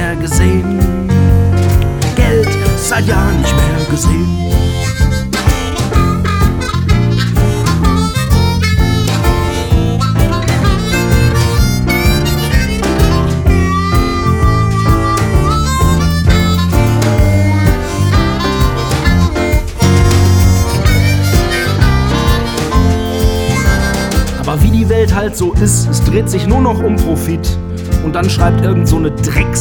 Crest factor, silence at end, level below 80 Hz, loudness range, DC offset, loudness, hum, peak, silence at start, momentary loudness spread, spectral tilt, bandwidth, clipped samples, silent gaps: 10 dB; 0 s; -16 dBFS; 2 LU; under 0.1%; -12 LUFS; none; 0 dBFS; 0 s; 3 LU; -5.5 dB/octave; 20 kHz; under 0.1%; none